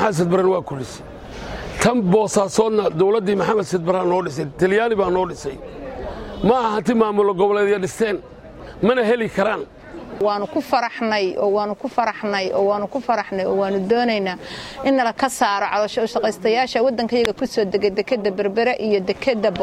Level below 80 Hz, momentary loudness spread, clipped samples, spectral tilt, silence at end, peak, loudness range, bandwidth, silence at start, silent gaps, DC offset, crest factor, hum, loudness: -46 dBFS; 13 LU; under 0.1%; -5 dB/octave; 0 s; -2 dBFS; 2 LU; 14.5 kHz; 0 s; none; under 0.1%; 16 dB; none; -19 LUFS